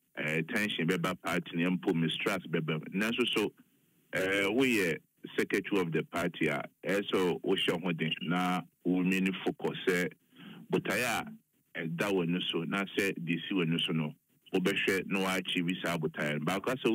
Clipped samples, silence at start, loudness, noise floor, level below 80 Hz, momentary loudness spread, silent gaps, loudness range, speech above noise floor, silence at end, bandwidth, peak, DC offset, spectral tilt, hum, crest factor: under 0.1%; 0.15 s; -32 LUFS; -69 dBFS; -72 dBFS; 6 LU; none; 2 LU; 38 dB; 0 s; 16 kHz; -14 dBFS; under 0.1%; -5 dB/octave; none; 18 dB